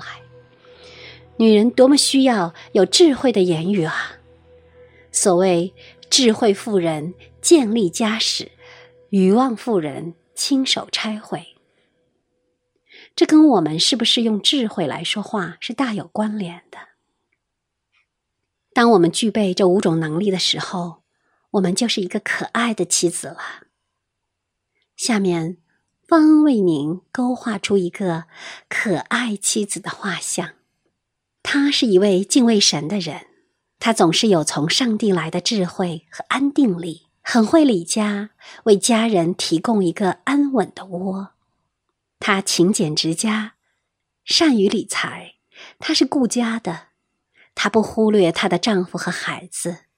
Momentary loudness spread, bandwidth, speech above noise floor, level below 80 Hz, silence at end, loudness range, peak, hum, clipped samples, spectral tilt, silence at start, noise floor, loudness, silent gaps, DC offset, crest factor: 15 LU; 16 kHz; 60 dB; -64 dBFS; 0.2 s; 6 LU; 0 dBFS; none; under 0.1%; -4 dB/octave; 0 s; -78 dBFS; -18 LUFS; none; under 0.1%; 20 dB